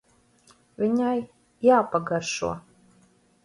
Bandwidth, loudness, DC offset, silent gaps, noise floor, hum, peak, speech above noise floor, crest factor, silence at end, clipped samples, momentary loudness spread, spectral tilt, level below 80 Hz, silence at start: 11.5 kHz; -24 LUFS; under 0.1%; none; -61 dBFS; none; -8 dBFS; 38 dB; 18 dB; 0.85 s; under 0.1%; 12 LU; -5 dB/octave; -60 dBFS; 0.8 s